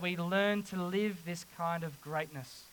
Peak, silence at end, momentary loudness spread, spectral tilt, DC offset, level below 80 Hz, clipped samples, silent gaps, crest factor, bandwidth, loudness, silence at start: -18 dBFS; 0 s; 11 LU; -5.5 dB/octave; under 0.1%; -74 dBFS; under 0.1%; none; 18 dB; 19 kHz; -35 LUFS; 0 s